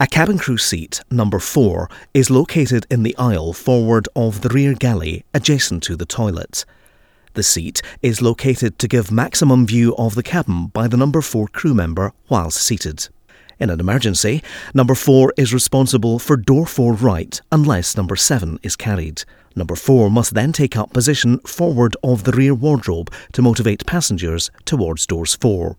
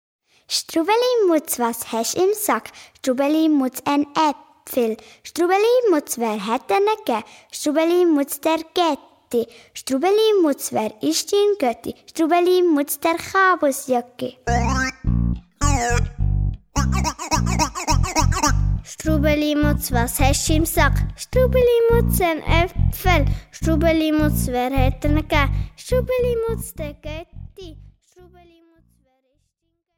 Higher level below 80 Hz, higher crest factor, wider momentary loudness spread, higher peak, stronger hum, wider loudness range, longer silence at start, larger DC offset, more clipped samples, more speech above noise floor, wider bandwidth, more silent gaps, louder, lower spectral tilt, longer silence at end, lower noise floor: second, -38 dBFS vs -28 dBFS; about the same, 16 dB vs 16 dB; about the same, 9 LU vs 9 LU; about the same, 0 dBFS vs -2 dBFS; neither; about the same, 4 LU vs 4 LU; second, 0 s vs 0.5 s; neither; neither; second, 36 dB vs 55 dB; about the same, 19.5 kHz vs 19 kHz; neither; first, -16 LUFS vs -20 LUFS; about the same, -5 dB/octave vs -5 dB/octave; second, 0.05 s vs 2.1 s; second, -52 dBFS vs -74 dBFS